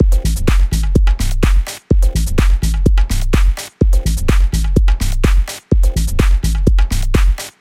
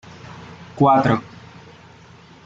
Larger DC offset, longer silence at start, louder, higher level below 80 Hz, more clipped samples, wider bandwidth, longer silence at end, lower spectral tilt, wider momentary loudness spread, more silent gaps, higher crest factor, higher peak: neither; second, 0 s vs 0.25 s; about the same, -16 LUFS vs -17 LUFS; first, -12 dBFS vs -56 dBFS; neither; first, 15 kHz vs 7.8 kHz; second, 0.1 s vs 1.05 s; second, -5.5 dB/octave vs -8 dB/octave; second, 2 LU vs 24 LU; neither; second, 12 dB vs 18 dB; first, 0 dBFS vs -4 dBFS